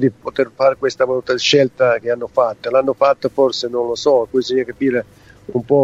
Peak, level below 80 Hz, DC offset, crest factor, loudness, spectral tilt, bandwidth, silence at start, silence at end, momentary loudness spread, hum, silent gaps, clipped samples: 0 dBFS; -56 dBFS; under 0.1%; 16 dB; -17 LUFS; -5 dB/octave; 7.8 kHz; 0 s; 0 s; 7 LU; none; none; under 0.1%